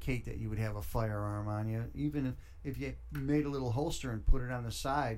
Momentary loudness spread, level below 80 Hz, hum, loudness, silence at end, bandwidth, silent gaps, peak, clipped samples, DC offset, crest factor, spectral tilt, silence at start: 7 LU; -40 dBFS; none; -37 LUFS; 0 s; 16.5 kHz; none; -14 dBFS; under 0.1%; under 0.1%; 20 dB; -6.5 dB/octave; 0 s